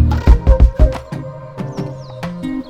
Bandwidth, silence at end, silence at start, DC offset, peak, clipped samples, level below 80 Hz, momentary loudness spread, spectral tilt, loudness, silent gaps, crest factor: 6.8 kHz; 0 s; 0 s; under 0.1%; 0 dBFS; 0.4%; -16 dBFS; 15 LU; -8.5 dB/octave; -16 LUFS; none; 14 dB